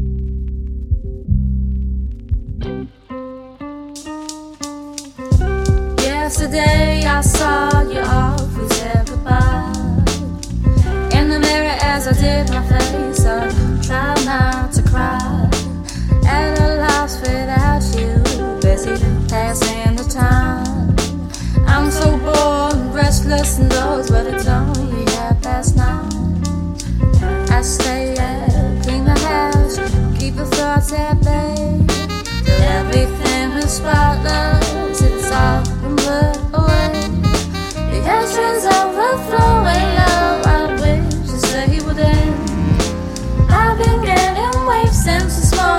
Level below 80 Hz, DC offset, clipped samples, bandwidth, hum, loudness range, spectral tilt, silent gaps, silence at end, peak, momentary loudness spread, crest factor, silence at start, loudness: -20 dBFS; under 0.1%; under 0.1%; 16.5 kHz; none; 3 LU; -5.5 dB/octave; none; 0 s; 0 dBFS; 9 LU; 14 dB; 0 s; -16 LUFS